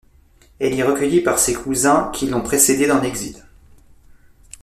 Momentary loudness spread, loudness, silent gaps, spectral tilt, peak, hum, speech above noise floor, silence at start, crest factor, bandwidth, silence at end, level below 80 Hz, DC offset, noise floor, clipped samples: 10 LU; -17 LUFS; none; -3.5 dB/octave; 0 dBFS; none; 34 dB; 0.6 s; 20 dB; 14.5 kHz; 1.25 s; -44 dBFS; under 0.1%; -51 dBFS; under 0.1%